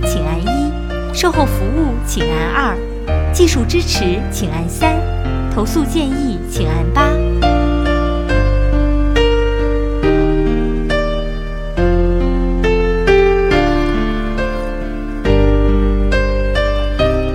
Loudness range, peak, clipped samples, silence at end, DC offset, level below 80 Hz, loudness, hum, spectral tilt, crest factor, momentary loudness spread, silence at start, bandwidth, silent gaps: 2 LU; 0 dBFS; under 0.1%; 0 s; under 0.1%; -18 dBFS; -16 LUFS; none; -6 dB/octave; 14 dB; 7 LU; 0 s; 16 kHz; none